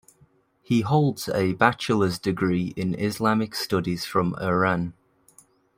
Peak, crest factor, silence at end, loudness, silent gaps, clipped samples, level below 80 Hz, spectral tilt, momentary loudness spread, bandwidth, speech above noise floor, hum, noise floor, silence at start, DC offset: -2 dBFS; 22 dB; 0.85 s; -24 LUFS; none; under 0.1%; -58 dBFS; -6 dB/octave; 6 LU; 16 kHz; 37 dB; none; -61 dBFS; 0.7 s; under 0.1%